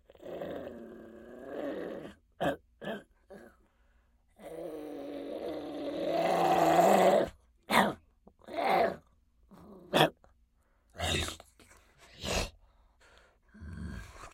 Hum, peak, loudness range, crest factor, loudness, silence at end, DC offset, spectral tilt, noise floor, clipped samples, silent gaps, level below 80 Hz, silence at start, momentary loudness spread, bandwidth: none; -6 dBFS; 13 LU; 28 dB; -31 LUFS; 0.05 s; under 0.1%; -4.5 dB/octave; -69 dBFS; under 0.1%; none; -56 dBFS; 0.2 s; 23 LU; 16.5 kHz